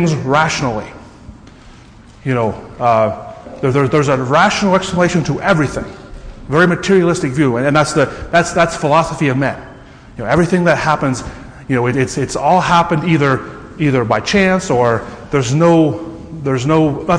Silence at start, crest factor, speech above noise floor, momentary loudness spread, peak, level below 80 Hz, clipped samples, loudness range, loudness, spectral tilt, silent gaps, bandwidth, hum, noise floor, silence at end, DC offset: 0 s; 14 dB; 26 dB; 14 LU; 0 dBFS; -38 dBFS; under 0.1%; 3 LU; -14 LUFS; -6 dB/octave; none; 10.5 kHz; none; -40 dBFS; 0 s; under 0.1%